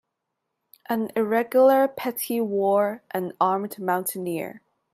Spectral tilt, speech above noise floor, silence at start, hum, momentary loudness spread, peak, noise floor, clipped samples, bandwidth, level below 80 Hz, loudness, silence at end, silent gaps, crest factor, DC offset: -5 dB/octave; 58 dB; 0.9 s; none; 12 LU; -8 dBFS; -81 dBFS; under 0.1%; 16 kHz; -74 dBFS; -24 LUFS; 0.35 s; none; 16 dB; under 0.1%